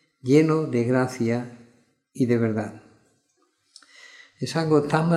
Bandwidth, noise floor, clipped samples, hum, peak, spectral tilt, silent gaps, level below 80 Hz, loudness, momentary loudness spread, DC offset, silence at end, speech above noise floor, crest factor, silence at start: 13 kHz; -69 dBFS; under 0.1%; none; -4 dBFS; -7 dB/octave; none; -68 dBFS; -23 LUFS; 12 LU; under 0.1%; 0 s; 47 dB; 20 dB; 0.25 s